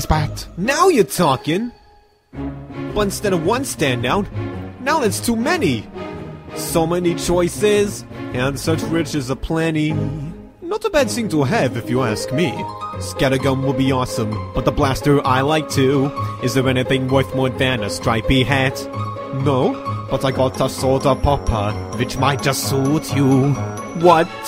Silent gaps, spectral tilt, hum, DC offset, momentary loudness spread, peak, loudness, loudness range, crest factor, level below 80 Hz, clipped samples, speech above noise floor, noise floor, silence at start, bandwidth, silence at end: none; -5.5 dB/octave; none; under 0.1%; 11 LU; 0 dBFS; -18 LUFS; 3 LU; 18 dB; -36 dBFS; under 0.1%; 33 dB; -51 dBFS; 0 s; 16 kHz; 0 s